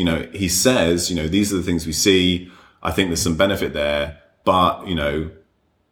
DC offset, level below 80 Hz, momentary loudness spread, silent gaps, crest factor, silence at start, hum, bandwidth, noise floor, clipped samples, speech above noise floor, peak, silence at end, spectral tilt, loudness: under 0.1%; -38 dBFS; 9 LU; none; 18 dB; 0 s; none; over 20 kHz; -62 dBFS; under 0.1%; 43 dB; -2 dBFS; 0.6 s; -4 dB/octave; -19 LUFS